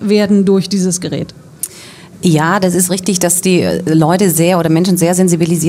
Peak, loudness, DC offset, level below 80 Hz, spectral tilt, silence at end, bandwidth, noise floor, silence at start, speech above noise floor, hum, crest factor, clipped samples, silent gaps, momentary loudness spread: 0 dBFS; -12 LUFS; under 0.1%; -50 dBFS; -5 dB/octave; 0 s; 16.5 kHz; -35 dBFS; 0 s; 23 dB; none; 12 dB; under 0.1%; none; 12 LU